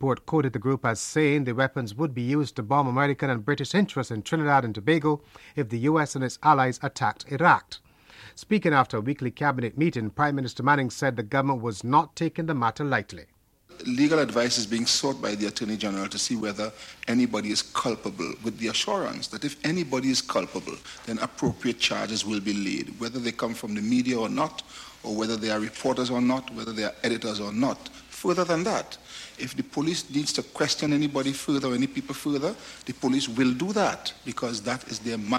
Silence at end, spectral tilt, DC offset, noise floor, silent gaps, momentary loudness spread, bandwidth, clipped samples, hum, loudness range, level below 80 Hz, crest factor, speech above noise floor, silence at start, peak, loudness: 0 s; -4.5 dB/octave; under 0.1%; -50 dBFS; none; 10 LU; 15.5 kHz; under 0.1%; none; 4 LU; -60 dBFS; 20 dB; 24 dB; 0 s; -6 dBFS; -26 LUFS